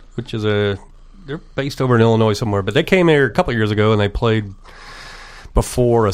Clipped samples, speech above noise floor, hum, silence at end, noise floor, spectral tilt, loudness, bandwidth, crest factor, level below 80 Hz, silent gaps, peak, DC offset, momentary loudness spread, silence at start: under 0.1%; 20 dB; none; 0 s; -36 dBFS; -6.5 dB/octave; -17 LUFS; 15.5 kHz; 18 dB; -32 dBFS; none; 0 dBFS; under 0.1%; 21 LU; 0 s